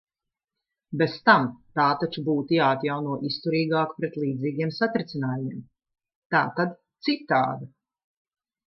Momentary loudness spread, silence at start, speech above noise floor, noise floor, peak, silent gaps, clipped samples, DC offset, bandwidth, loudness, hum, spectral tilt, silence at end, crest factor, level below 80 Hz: 9 LU; 0.9 s; 63 dB; -88 dBFS; -4 dBFS; 6.15-6.30 s; under 0.1%; under 0.1%; 6 kHz; -25 LUFS; none; -8 dB/octave; 1 s; 24 dB; -70 dBFS